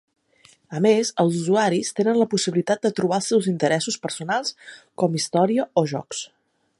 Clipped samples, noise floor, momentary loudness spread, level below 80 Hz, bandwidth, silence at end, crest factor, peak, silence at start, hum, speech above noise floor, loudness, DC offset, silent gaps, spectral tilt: under 0.1%; -56 dBFS; 11 LU; -70 dBFS; 11.5 kHz; 0.55 s; 18 dB; -4 dBFS; 0.7 s; none; 35 dB; -22 LUFS; under 0.1%; none; -5 dB/octave